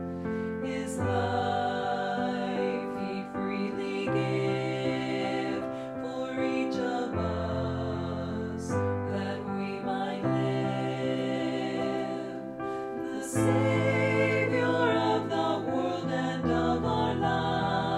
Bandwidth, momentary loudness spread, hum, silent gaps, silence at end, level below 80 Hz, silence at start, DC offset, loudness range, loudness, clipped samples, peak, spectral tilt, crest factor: 13.5 kHz; 8 LU; none; none; 0 s; -54 dBFS; 0 s; under 0.1%; 4 LU; -30 LUFS; under 0.1%; -14 dBFS; -6.5 dB/octave; 16 dB